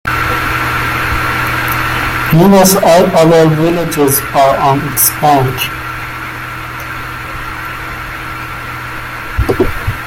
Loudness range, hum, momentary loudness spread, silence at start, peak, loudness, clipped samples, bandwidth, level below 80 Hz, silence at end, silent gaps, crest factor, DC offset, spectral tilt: 13 LU; none; 15 LU; 0.05 s; 0 dBFS; -12 LUFS; under 0.1%; 17 kHz; -28 dBFS; 0 s; none; 12 dB; under 0.1%; -4.5 dB/octave